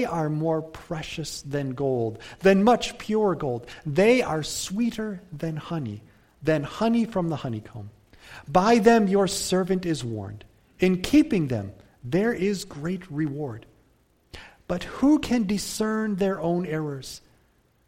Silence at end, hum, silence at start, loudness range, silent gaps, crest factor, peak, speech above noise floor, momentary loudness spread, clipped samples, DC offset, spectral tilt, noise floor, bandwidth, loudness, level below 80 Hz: 0.7 s; none; 0 s; 5 LU; none; 20 dB; -4 dBFS; 39 dB; 16 LU; under 0.1%; under 0.1%; -5.5 dB/octave; -63 dBFS; 16.5 kHz; -25 LUFS; -50 dBFS